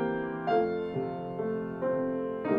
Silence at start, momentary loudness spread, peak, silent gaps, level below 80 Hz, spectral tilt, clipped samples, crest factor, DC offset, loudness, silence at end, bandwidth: 0 s; 6 LU; -14 dBFS; none; -62 dBFS; -9.5 dB/octave; under 0.1%; 16 dB; under 0.1%; -32 LUFS; 0 s; 5.4 kHz